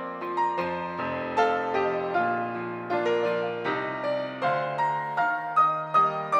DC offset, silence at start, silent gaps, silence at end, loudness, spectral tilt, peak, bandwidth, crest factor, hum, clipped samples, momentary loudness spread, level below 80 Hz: under 0.1%; 0 s; none; 0 s; -27 LUFS; -6 dB/octave; -10 dBFS; 10 kHz; 16 dB; none; under 0.1%; 7 LU; -74 dBFS